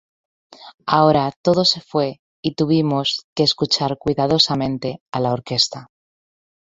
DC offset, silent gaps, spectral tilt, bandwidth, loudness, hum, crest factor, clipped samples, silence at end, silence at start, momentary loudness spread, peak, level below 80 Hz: under 0.1%; 0.74-0.78 s, 1.36-1.44 s, 2.19-2.43 s, 3.24-3.36 s, 5.00-5.06 s; -5 dB/octave; 8 kHz; -19 LUFS; none; 20 dB; under 0.1%; 0.9 s; 0.6 s; 10 LU; -2 dBFS; -54 dBFS